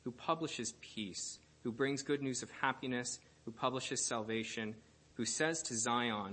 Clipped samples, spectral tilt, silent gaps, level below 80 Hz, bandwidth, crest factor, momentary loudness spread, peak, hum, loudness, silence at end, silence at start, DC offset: under 0.1%; -3 dB/octave; none; -74 dBFS; 8.8 kHz; 22 dB; 10 LU; -18 dBFS; none; -38 LUFS; 0 s; 0.05 s; under 0.1%